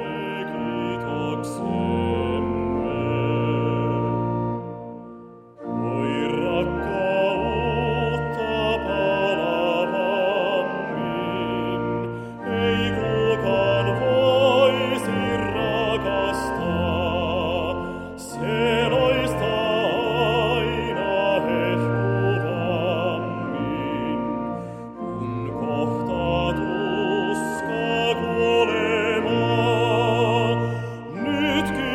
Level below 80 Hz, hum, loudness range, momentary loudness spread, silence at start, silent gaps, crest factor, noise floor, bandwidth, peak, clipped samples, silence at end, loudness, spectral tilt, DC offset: -44 dBFS; none; 5 LU; 9 LU; 0 s; none; 16 dB; -43 dBFS; 14 kHz; -6 dBFS; under 0.1%; 0 s; -23 LUFS; -6.5 dB/octave; under 0.1%